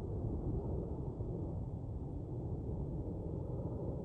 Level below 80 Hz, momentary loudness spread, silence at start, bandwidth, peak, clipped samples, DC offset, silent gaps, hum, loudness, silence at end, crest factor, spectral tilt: -46 dBFS; 4 LU; 0 s; 3.6 kHz; -26 dBFS; under 0.1%; under 0.1%; none; none; -42 LUFS; 0 s; 14 dB; -12 dB/octave